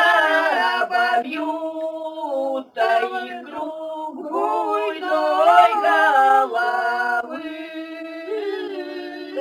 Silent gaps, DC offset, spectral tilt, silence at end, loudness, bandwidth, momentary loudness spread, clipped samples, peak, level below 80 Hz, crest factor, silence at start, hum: none; under 0.1%; -2 dB/octave; 0 s; -20 LUFS; 17 kHz; 16 LU; under 0.1%; -2 dBFS; -80 dBFS; 18 dB; 0 s; none